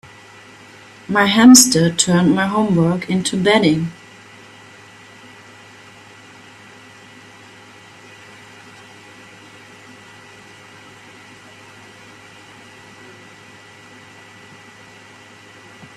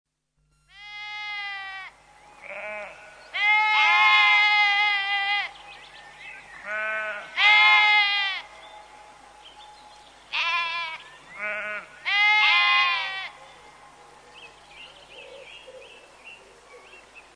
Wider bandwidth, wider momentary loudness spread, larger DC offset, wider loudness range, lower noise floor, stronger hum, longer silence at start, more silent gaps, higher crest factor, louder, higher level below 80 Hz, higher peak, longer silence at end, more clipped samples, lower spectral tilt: first, 15.5 kHz vs 10.5 kHz; first, 33 LU vs 25 LU; neither; first, 28 LU vs 11 LU; second, -43 dBFS vs -70 dBFS; neither; first, 1.1 s vs 0.8 s; neither; about the same, 20 dB vs 22 dB; first, -13 LUFS vs -20 LUFS; first, -58 dBFS vs -68 dBFS; first, 0 dBFS vs -4 dBFS; first, 12.05 s vs 0.15 s; neither; first, -4 dB/octave vs 1 dB/octave